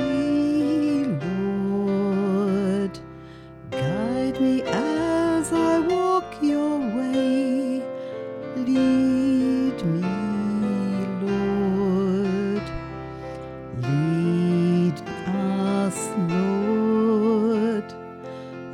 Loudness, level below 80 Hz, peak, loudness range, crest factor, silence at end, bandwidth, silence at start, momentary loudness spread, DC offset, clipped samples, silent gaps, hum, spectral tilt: -23 LUFS; -50 dBFS; -10 dBFS; 2 LU; 12 dB; 0 s; 12.5 kHz; 0 s; 13 LU; under 0.1%; under 0.1%; none; none; -7 dB/octave